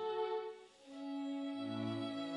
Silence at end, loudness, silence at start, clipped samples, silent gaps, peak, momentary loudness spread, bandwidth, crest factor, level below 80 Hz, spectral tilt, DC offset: 0 s; -42 LUFS; 0 s; under 0.1%; none; -28 dBFS; 11 LU; 10.5 kHz; 14 dB; -86 dBFS; -6.5 dB/octave; under 0.1%